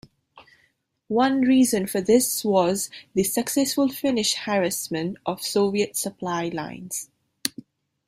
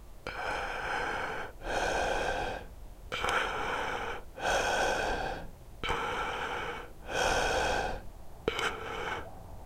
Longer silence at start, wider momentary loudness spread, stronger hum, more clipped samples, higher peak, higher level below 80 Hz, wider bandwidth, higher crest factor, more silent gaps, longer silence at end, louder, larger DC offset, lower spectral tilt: first, 0.35 s vs 0 s; about the same, 11 LU vs 13 LU; neither; neither; first, -2 dBFS vs -10 dBFS; second, -64 dBFS vs -46 dBFS; about the same, 16 kHz vs 16 kHz; about the same, 22 dB vs 24 dB; neither; first, 0.6 s vs 0 s; first, -23 LUFS vs -33 LUFS; neither; about the same, -3.5 dB/octave vs -3 dB/octave